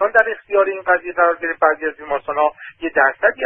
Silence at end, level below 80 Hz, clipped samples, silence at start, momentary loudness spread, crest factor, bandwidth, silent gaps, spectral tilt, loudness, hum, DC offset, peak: 0 s; -56 dBFS; under 0.1%; 0 s; 7 LU; 18 dB; 3.7 kHz; none; -6 dB/octave; -18 LUFS; none; under 0.1%; 0 dBFS